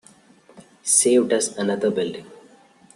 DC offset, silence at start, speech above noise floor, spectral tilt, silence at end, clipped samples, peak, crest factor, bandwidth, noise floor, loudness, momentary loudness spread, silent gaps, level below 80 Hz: under 0.1%; 0.55 s; 32 dB; -3 dB/octave; 0.55 s; under 0.1%; -2 dBFS; 22 dB; 12.5 kHz; -53 dBFS; -20 LUFS; 15 LU; none; -68 dBFS